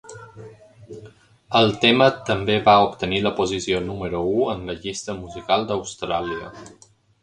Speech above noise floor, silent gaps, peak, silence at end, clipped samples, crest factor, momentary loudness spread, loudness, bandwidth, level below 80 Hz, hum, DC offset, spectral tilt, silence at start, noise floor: 27 dB; none; 0 dBFS; 0.55 s; under 0.1%; 22 dB; 19 LU; -21 LUFS; 11 kHz; -48 dBFS; none; under 0.1%; -4.5 dB/octave; 0.05 s; -47 dBFS